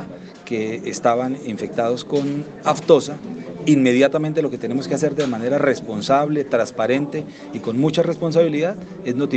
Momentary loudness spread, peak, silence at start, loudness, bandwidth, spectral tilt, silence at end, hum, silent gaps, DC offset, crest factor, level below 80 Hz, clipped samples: 12 LU; 0 dBFS; 0 s; -20 LUFS; 9 kHz; -6 dB/octave; 0 s; none; none; under 0.1%; 20 dB; -62 dBFS; under 0.1%